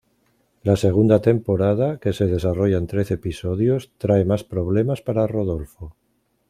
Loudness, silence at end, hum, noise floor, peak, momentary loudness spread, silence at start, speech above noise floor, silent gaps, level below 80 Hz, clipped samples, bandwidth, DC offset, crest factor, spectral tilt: -21 LUFS; 0.6 s; none; -67 dBFS; -2 dBFS; 9 LU; 0.65 s; 48 dB; none; -46 dBFS; under 0.1%; 14 kHz; under 0.1%; 18 dB; -8.5 dB/octave